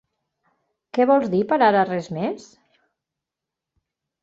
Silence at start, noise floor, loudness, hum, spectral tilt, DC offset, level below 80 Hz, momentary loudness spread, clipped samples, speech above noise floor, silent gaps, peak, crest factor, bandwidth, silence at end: 0.95 s; -86 dBFS; -20 LUFS; none; -7 dB/octave; under 0.1%; -66 dBFS; 11 LU; under 0.1%; 66 dB; none; -4 dBFS; 20 dB; 7.8 kHz; 1.85 s